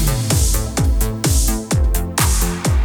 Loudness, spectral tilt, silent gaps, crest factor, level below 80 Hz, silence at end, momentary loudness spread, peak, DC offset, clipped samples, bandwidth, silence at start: -17 LUFS; -4 dB/octave; none; 14 dB; -18 dBFS; 0 s; 2 LU; -2 dBFS; under 0.1%; under 0.1%; 18.5 kHz; 0 s